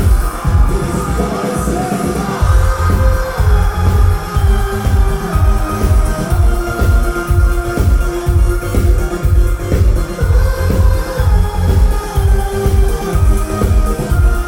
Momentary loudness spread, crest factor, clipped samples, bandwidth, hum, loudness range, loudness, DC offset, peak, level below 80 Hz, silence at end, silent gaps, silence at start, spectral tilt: 3 LU; 10 dB; under 0.1%; 16.5 kHz; none; 1 LU; -15 LUFS; under 0.1%; 0 dBFS; -14 dBFS; 0 s; none; 0 s; -6.5 dB/octave